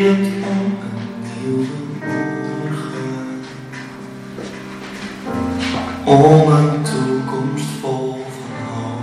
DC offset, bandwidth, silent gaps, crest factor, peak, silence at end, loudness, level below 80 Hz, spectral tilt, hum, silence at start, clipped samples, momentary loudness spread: under 0.1%; 13 kHz; none; 18 dB; 0 dBFS; 0 s; -18 LUFS; -50 dBFS; -7 dB/octave; none; 0 s; under 0.1%; 19 LU